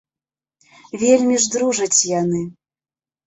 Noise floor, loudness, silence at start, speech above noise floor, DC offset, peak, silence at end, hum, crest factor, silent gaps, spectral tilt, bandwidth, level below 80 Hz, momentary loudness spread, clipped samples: under -90 dBFS; -17 LUFS; 0.95 s; over 73 dB; under 0.1%; -2 dBFS; 0.75 s; none; 18 dB; none; -3.5 dB/octave; 8.4 kHz; -60 dBFS; 12 LU; under 0.1%